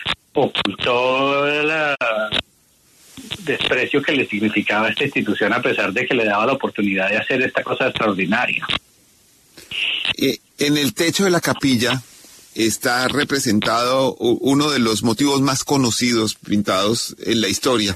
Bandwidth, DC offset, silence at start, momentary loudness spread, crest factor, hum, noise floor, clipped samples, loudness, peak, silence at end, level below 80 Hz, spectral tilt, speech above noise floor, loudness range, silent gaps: 13.5 kHz; under 0.1%; 0 s; 5 LU; 16 dB; none; -56 dBFS; under 0.1%; -18 LUFS; -4 dBFS; 0 s; -54 dBFS; -3.5 dB/octave; 38 dB; 3 LU; none